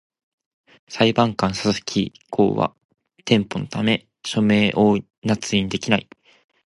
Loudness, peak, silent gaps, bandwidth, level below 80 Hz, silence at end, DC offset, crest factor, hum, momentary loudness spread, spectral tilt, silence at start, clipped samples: -21 LUFS; -2 dBFS; 2.85-2.89 s, 5.18-5.22 s; 11.5 kHz; -52 dBFS; 0.65 s; under 0.1%; 20 dB; none; 9 LU; -5.5 dB/octave; 0.9 s; under 0.1%